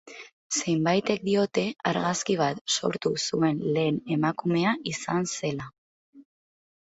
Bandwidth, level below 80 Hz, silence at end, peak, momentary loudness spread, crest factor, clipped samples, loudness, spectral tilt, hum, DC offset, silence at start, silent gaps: 8.2 kHz; -66 dBFS; 0.75 s; -8 dBFS; 6 LU; 18 dB; under 0.1%; -26 LUFS; -4.5 dB/octave; none; under 0.1%; 0.05 s; 0.32-0.50 s, 2.61-2.65 s, 5.78-6.13 s